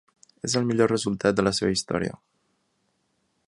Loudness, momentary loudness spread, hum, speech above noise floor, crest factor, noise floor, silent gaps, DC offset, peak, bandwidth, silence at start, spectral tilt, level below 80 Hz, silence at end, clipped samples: -25 LUFS; 7 LU; none; 48 dB; 20 dB; -72 dBFS; none; under 0.1%; -6 dBFS; 11.5 kHz; 0.45 s; -4.5 dB/octave; -54 dBFS; 1.35 s; under 0.1%